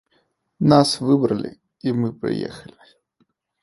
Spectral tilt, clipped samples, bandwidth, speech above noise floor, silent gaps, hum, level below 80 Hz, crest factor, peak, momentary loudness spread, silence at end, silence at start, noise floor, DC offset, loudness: -6.5 dB/octave; under 0.1%; 11.5 kHz; 47 dB; none; none; -56 dBFS; 22 dB; 0 dBFS; 16 LU; 1 s; 0.6 s; -67 dBFS; under 0.1%; -20 LUFS